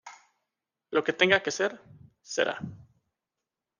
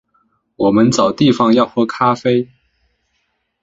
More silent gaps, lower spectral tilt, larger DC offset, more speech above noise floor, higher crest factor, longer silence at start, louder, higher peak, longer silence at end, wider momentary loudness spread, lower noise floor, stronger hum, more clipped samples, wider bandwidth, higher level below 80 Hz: neither; second, -3 dB/octave vs -6 dB/octave; neither; first, 60 dB vs 54 dB; first, 26 dB vs 14 dB; second, 0.05 s vs 0.6 s; second, -27 LUFS vs -14 LUFS; second, -6 dBFS vs -2 dBFS; second, 0.95 s vs 1.2 s; first, 14 LU vs 6 LU; first, -88 dBFS vs -67 dBFS; neither; neither; first, 10 kHz vs 7.8 kHz; second, -72 dBFS vs -54 dBFS